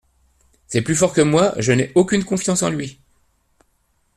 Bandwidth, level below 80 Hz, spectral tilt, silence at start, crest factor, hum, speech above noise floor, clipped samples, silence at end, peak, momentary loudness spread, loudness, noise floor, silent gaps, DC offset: 14 kHz; -50 dBFS; -5 dB/octave; 0.7 s; 18 dB; none; 47 dB; under 0.1%; 1.25 s; -2 dBFS; 8 LU; -18 LUFS; -64 dBFS; none; under 0.1%